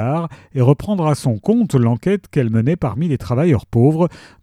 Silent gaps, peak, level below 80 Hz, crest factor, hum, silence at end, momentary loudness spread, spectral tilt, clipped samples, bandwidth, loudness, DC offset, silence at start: none; 0 dBFS; -44 dBFS; 16 dB; none; 0.25 s; 6 LU; -8.5 dB/octave; under 0.1%; 13.5 kHz; -17 LUFS; under 0.1%; 0 s